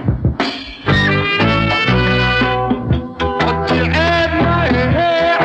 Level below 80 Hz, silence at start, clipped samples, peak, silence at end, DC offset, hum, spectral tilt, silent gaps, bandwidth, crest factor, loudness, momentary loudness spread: -28 dBFS; 0 s; under 0.1%; -2 dBFS; 0 s; under 0.1%; none; -6.5 dB/octave; none; 8.4 kHz; 14 dB; -14 LUFS; 5 LU